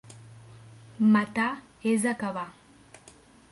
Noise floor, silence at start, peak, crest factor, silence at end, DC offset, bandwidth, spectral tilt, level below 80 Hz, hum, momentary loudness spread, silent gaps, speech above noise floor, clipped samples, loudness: -55 dBFS; 0.1 s; -12 dBFS; 16 dB; 1 s; under 0.1%; 11.5 kHz; -5.5 dB/octave; -68 dBFS; none; 20 LU; none; 29 dB; under 0.1%; -27 LUFS